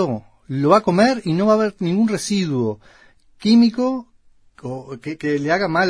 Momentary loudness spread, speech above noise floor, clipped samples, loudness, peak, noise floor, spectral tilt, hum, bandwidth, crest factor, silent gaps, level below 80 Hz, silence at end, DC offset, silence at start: 16 LU; 33 dB; under 0.1%; -18 LUFS; -2 dBFS; -51 dBFS; -6 dB/octave; none; 11 kHz; 18 dB; none; -56 dBFS; 0 s; under 0.1%; 0 s